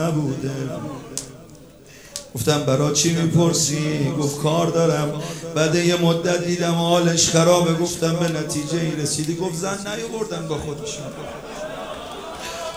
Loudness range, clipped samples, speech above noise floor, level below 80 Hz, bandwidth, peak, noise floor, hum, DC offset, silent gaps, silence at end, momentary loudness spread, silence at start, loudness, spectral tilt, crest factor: 7 LU; under 0.1%; 24 dB; -52 dBFS; over 20 kHz; -2 dBFS; -44 dBFS; none; 0.1%; none; 0 s; 15 LU; 0 s; -21 LUFS; -4.5 dB/octave; 20 dB